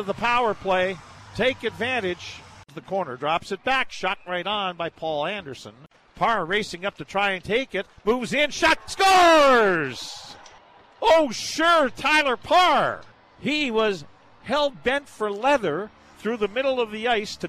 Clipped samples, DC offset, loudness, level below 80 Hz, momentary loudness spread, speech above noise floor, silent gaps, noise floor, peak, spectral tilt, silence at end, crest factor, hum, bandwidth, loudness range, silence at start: under 0.1%; under 0.1%; -22 LUFS; -52 dBFS; 16 LU; 28 dB; none; -51 dBFS; -8 dBFS; -3.5 dB/octave; 0 s; 16 dB; none; 14 kHz; 7 LU; 0 s